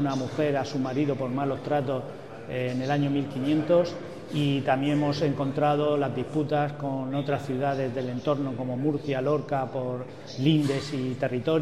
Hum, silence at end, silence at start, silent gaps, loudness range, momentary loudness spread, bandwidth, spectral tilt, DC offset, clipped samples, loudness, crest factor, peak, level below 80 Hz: none; 0 s; 0 s; none; 3 LU; 7 LU; 12 kHz; -7.5 dB/octave; 0.3%; under 0.1%; -27 LUFS; 16 dB; -10 dBFS; -64 dBFS